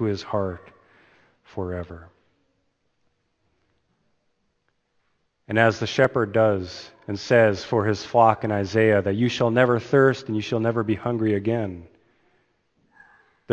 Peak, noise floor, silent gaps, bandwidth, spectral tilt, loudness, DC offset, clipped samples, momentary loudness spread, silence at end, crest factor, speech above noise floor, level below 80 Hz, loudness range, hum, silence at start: -2 dBFS; -71 dBFS; none; 8.4 kHz; -6.5 dB/octave; -22 LUFS; under 0.1%; under 0.1%; 15 LU; 0 s; 22 dB; 50 dB; -58 dBFS; 19 LU; none; 0 s